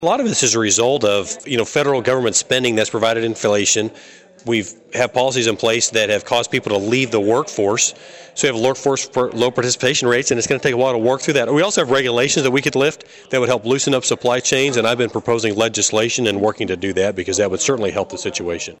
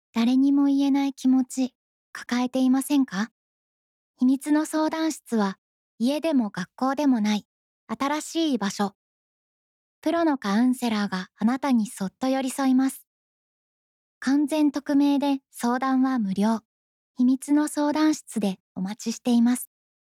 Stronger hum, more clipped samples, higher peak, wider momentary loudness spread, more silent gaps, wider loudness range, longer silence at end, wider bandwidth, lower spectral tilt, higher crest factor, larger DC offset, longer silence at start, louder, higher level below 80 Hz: neither; neither; first, -4 dBFS vs -14 dBFS; second, 6 LU vs 9 LU; second, none vs 1.75-2.13 s, 3.31-4.14 s, 5.58-5.98 s, 7.45-7.87 s, 8.95-10.02 s, 13.07-14.21 s, 16.65-17.15 s, 18.60-18.75 s; about the same, 2 LU vs 3 LU; second, 0.05 s vs 0.45 s; about the same, 16.5 kHz vs 15 kHz; second, -3 dB/octave vs -5 dB/octave; about the same, 14 dB vs 10 dB; neither; second, 0 s vs 0.15 s; first, -17 LUFS vs -24 LUFS; first, -56 dBFS vs -74 dBFS